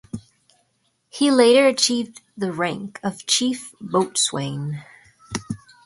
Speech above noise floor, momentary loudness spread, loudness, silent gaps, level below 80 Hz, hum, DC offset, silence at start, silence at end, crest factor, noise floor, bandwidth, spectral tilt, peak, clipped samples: 48 dB; 20 LU; -20 LUFS; none; -60 dBFS; none; under 0.1%; 0.15 s; 0.3 s; 18 dB; -68 dBFS; 11.5 kHz; -3.5 dB/octave; -4 dBFS; under 0.1%